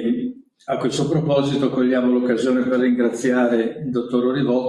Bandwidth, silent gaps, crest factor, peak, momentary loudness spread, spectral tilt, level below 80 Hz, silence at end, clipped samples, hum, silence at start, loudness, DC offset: 11 kHz; none; 14 dB; -6 dBFS; 7 LU; -6.5 dB/octave; -60 dBFS; 0 s; under 0.1%; none; 0 s; -20 LUFS; under 0.1%